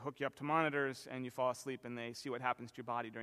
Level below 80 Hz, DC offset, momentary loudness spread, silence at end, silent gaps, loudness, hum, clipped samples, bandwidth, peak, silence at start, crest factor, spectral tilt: -82 dBFS; under 0.1%; 10 LU; 0 s; none; -40 LUFS; none; under 0.1%; 15 kHz; -18 dBFS; 0 s; 22 dB; -5 dB/octave